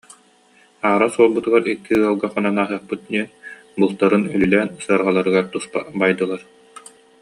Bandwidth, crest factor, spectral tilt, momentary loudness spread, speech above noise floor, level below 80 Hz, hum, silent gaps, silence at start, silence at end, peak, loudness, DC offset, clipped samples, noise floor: 11.5 kHz; 18 dB; -6 dB/octave; 10 LU; 36 dB; -56 dBFS; none; none; 0.85 s; 0.4 s; -2 dBFS; -19 LUFS; under 0.1%; under 0.1%; -54 dBFS